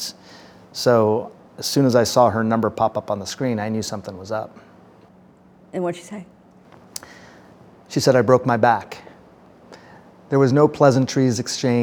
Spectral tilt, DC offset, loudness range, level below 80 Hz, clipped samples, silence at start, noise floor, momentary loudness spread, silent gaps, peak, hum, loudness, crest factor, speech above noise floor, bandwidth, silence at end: -5.5 dB/octave; under 0.1%; 13 LU; -62 dBFS; under 0.1%; 0 s; -50 dBFS; 20 LU; none; -2 dBFS; none; -19 LUFS; 20 dB; 32 dB; over 20 kHz; 0 s